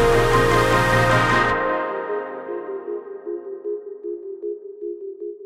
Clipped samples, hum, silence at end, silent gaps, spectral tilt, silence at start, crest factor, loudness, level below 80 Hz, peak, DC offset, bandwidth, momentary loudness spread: under 0.1%; none; 0 s; none; -5.5 dB/octave; 0 s; 16 dB; -21 LUFS; -36 dBFS; -4 dBFS; under 0.1%; 16 kHz; 16 LU